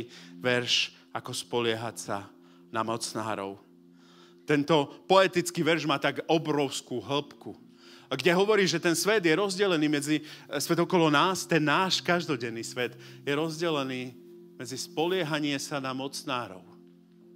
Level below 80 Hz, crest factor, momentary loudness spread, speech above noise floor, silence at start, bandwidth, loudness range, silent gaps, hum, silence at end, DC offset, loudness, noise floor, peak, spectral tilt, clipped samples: -78 dBFS; 22 dB; 13 LU; 28 dB; 0 s; 16 kHz; 7 LU; none; none; 0.6 s; under 0.1%; -28 LUFS; -56 dBFS; -6 dBFS; -4 dB/octave; under 0.1%